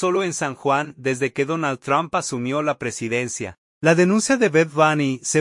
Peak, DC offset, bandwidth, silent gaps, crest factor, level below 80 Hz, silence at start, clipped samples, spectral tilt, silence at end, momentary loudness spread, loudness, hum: -4 dBFS; under 0.1%; 11.5 kHz; 3.58-3.81 s; 18 dB; -62 dBFS; 0 s; under 0.1%; -4.5 dB/octave; 0 s; 7 LU; -21 LUFS; none